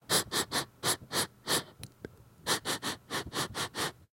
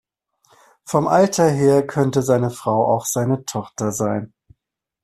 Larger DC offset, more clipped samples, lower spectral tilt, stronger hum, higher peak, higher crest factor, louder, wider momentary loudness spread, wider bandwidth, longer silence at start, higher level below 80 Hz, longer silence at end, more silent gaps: neither; neither; second, -1.5 dB/octave vs -6 dB/octave; neither; second, -14 dBFS vs -2 dBFS; about the same, 20 dB vs 18 dB; second, -32 LUFS vs -19 LUFS; first, 18 LU vs 9 LU; first, 16.5 kHz vs 14.5 kHz; second, 0.1 s vs 0.85 s; second, -62 dBFS vs -56 dBFS; second, 0.2 s vs 0.75 s; neither